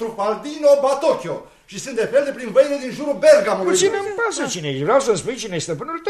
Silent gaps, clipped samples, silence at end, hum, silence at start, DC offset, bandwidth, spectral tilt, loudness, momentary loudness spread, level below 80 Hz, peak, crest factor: none; under 0.1%; 0 s; none; 0 s; under 0.1%; 13 kHz; -4 dB/octave; -18 LUFS; 11 LU; -56 dBFS; -2 dBFS; 16 dB